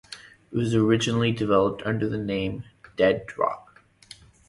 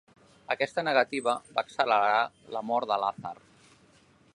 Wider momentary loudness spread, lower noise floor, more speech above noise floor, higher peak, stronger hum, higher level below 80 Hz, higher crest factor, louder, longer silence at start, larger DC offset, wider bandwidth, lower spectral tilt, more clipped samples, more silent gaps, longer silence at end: first, 18 LU vs 13 LU; second, -50 dBFS vs -61 dBFS; second, 27 dB vs 33 dB; about the same, -6 dBFS vs -8 dBFS; neither; first, -52 dBFS vs -74 dBFS; about the same, 18 dB vs 20 dB; first, -24 LUFS vs -28 LUFS; second, 0.1 s vs 0.5 s; neither; about the same, 11.5 kHz vs 11 kHz; first, -6 dB/octave vs -4 dB/octave; neither; neither; about the same, 0.9 s vs 1 s